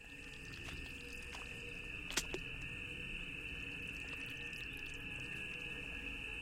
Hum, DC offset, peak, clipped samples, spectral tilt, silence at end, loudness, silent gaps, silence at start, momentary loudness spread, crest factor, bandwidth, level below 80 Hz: none; under 0.1%; -20 dBFS; under 0.1%; -2.5 dB/octave; 0 s; -44 LUFS; none; 0 s; 7 LU; 26 dB; 16.5 kHz; -56 dBFS